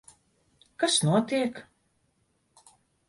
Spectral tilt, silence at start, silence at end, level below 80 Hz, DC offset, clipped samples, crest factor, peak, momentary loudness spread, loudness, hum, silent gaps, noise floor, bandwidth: -4 dB/octave; 0.8 s; 1.45 s; -70 dBFS; under 0.1%; under 0.1%; 20 dB; -12 dBFS; 10 LU; -26 LUFS; none; none; -72 dBFS; 11.5 kHz